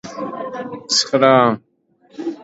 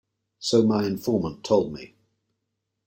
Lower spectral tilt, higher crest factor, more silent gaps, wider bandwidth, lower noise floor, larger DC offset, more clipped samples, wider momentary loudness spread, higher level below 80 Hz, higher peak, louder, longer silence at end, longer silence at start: second, -3.5 dB/octave vs -6 dB/octave; about the same, 18 dB vs 18 dB; neither; second, 8 kHz vs 16.5 kHz; second, -52 dBFS vs -80 dBFS; neither; neither; first, 16 LU vs 12 LU; about the same, -64 dBFS vs -60 dBFS; first, 0 dBFS vs -8 dBFS; first, -16 LUFS vs -24 LUFS; second, 0 s vs 1 s; second, 0.05 s vs 0.4 s